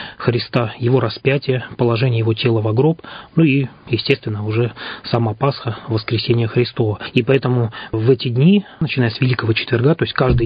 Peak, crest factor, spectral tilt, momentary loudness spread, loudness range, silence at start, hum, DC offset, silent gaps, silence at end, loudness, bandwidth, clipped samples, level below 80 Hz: 0 dBFS; 16 dB; -9.5 dB/octave; 7 LU; 3 LU; 0 s; none; under 0.1%; none; 0 s; -18 LUFS; 5.2 kHz; under 0.1%; -40 dBFS